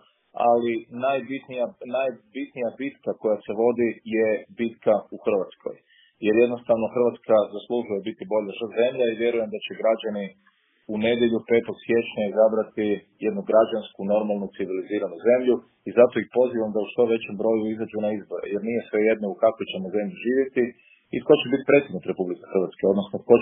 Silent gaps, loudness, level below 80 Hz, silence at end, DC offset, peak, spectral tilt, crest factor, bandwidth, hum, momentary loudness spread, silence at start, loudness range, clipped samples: none; -24 LUFS; -68 dBFS; 0 s; under 0.1%; -2 dBFS; -10.5 dB/octave; 22 dB; 3.8 kHz; none; 10 LU; 0.35 s; 3 LU; under 0.1%